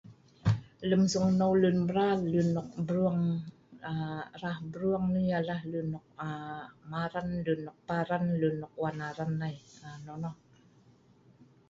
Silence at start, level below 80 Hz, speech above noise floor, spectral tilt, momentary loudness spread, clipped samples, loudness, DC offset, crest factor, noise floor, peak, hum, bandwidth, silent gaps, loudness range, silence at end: 0.05 s; -60 dBFS; 31 dB; -7 dB/octave; 14 LU; under 0.1%; -32 LUFS; under 0.1%; 16 dB; -62 dBFS; -14 dBFS; none; 7.8 kHz; none; 6 LU; 1.35 s